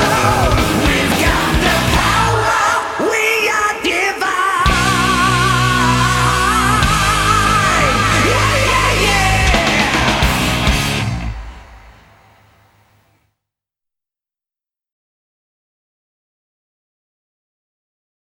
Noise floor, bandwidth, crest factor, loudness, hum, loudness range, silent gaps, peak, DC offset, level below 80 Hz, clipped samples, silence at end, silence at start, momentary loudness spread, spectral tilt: -89 dBFS; 18.5 kHz; 16 dB; -13 LUFS; none; 6 LU; none; 0 dBFS; under 0.1%; -26 dBFS; under 0.1%; 6.4 s; 0 s; 3 LU; -3.5 dB/octave